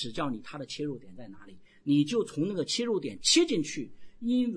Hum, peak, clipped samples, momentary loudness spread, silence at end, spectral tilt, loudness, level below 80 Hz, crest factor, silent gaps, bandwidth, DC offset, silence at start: none; -12 dBFS; under 0.1%; 20 LU; 0 s; -4 dB/octave; -29 LUFS; -62 dBFS; 18 dB; none; 10.5 kHz; under 0.1%; 0 s